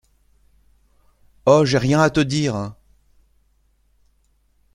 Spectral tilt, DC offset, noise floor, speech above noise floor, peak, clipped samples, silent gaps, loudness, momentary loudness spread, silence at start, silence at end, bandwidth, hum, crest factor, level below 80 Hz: -6 dB/octave; under 0.1%; -62 dBFS; 45 dB; -2 dBFS; under 0.1%; none; -18 LUFS; 11 LU; 1.45 s; 2 s; 11.5 kHz; none; 20 dB; -50 dBFS